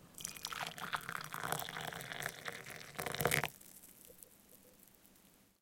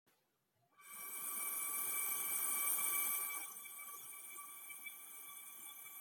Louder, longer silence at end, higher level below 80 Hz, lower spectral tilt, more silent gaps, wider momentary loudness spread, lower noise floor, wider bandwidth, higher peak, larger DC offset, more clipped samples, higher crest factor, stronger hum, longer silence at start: about the same, -41 LUFS vs -40 LUFS; first, 0.25 s vs 0 s; first, -68 dBFS vs under -90 dBFS; first, -2.5 dB/octave vs 2 dB/octave; neither; first, 25 LU vs 15 LU; second, -67 dBFS vs -81 dBFS; about the same, 17 kHz vs 17 kHz; first, -14 dBFS vs -24 dBFS; neither; neither; first, 30 dB vs 20 dB; neither; second, 0 s vs 0.8 s